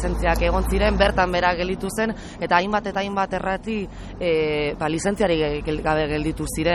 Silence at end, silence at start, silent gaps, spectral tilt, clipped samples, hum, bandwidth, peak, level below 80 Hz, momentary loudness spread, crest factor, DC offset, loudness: 0 s; 0 s; none; -5 dB/octave; under 0.1%; none; 13 kHz; -4 dBFS; -32 dBFS; 7 LU; 18 dB; under 0.1%; -22 LUFS